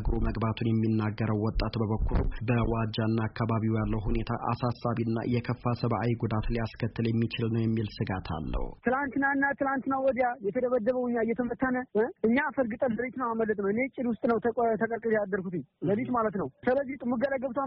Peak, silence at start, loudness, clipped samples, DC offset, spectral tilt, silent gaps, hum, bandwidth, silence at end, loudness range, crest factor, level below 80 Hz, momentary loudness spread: -14 dBFS; 0 s; -29 LUFS; under 0.1%; under 0.1%; -6.5 dB/octave; none; none; 5.8 kHz; 0 s; 2 LU; 16 dB; -40 dBFS; 5 LU